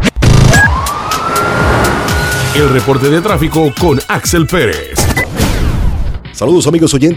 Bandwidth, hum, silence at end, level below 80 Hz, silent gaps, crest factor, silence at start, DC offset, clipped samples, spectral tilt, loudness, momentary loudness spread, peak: 20 kHz; none; 0 s; -18 dBFS; none; 10 dB; 0 s; under 0.1%; 0.4%; -5 dB/octave; -11 LUFS; 7 LU; 0 dBFS